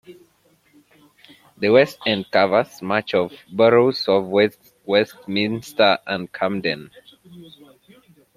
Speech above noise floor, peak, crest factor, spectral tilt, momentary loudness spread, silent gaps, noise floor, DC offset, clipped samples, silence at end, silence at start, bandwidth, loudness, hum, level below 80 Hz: 41 dB; -2 dBFS; 20 dB; -5.5 dB/octave; 9 LU; none; -60 dBFS; under 0.1%; under 0.1%; 0.9 s; 0.1 s; 15 kHz; -19 LUFS; none; -64 dBFS